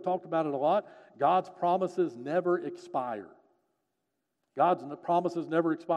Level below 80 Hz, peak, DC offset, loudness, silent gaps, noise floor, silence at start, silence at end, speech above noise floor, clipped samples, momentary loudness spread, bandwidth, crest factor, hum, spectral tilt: -88 dBFS; -14 dBFS; under 0.1%; -30 LUFS; none; -83 dBFS; 0 s; 0 s; 53 dB; under 0.1%; 7 LU; 9.4 kHz; 16 dB; none; -7.5 dB/octave